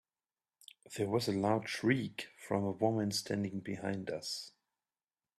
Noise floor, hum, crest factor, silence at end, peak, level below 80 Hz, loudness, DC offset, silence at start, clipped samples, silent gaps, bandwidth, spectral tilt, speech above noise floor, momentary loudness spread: under -90 dBFS; none; 22 dB; 0.9 s; -16 dBFS; -74 dBFS; -36 LUFS; under 0.1%; 0.9 s; under 0.1%; none; 14 kHz; -5 dB/octave; over 55 dB; 10 LU